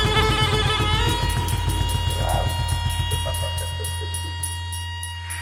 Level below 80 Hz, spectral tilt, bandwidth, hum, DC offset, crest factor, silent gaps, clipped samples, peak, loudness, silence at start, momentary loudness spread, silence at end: -30 dBFS; -4 dB/octave; 16.5 kHz; none; under 0.1%; 16 dB; none; under 0.1%; -6 dBFS; -23 LUFS; 0 s; 10 LU; 0 s